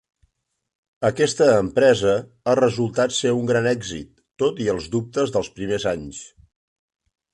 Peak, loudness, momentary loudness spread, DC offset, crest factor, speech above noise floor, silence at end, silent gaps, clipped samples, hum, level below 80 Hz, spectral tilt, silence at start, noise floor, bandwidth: -4 dBFS; -21 LUFS; 10 LU; under 0.1%; 18 dB; 49 dB; 1.05 s; none; under 0.1%; none; -52 dBFS; -5 dB/octave; 1 s; -69 dBFS; 11 kHz